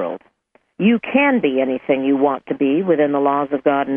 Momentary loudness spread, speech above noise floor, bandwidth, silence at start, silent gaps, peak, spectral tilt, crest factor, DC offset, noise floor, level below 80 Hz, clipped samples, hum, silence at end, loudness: 5 LU; 43 dB; 3.6 kHz; 0 s; none; -2 dBFS; -9.5 dB/octave; 16 dB; under 0.1%; -60 dBFS; -64 dBFS; under 0.1%; none; 0 s; -17 LUFS